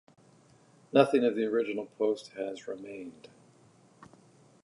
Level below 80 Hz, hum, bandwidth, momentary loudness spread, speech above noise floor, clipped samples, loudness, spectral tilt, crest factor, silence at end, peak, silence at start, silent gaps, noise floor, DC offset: -82 dBFS; none; 11 kHz; 18 LU; 32 dB; under 0.1%; -30 LUFS; -6 dB/octave; 26 dB; 1.55 s; -6 dBFS; 0.95 s; none; -61 dBFS; under 0.1%